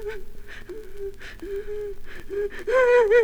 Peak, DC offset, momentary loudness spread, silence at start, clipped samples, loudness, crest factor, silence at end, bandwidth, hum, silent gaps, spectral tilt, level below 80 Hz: -8 dBFS; under 0.1%; 23 LU; 0 s; under 0.1%; -23 LUFS; 16 dB; 0 s; 14.5 kHz; 50 Hz at -55 dBFS; none; -4.5 dB/octave; -40 dBFS